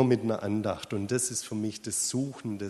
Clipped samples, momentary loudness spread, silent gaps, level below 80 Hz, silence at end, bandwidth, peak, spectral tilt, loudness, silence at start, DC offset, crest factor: under 0.1%; 6 LU; none; -66 dBFS; 0 s; 13 kHz; -10 dBFS; -4.5 dB/octave; -30 LUFS; 0 s; under 0.1%; 18 dB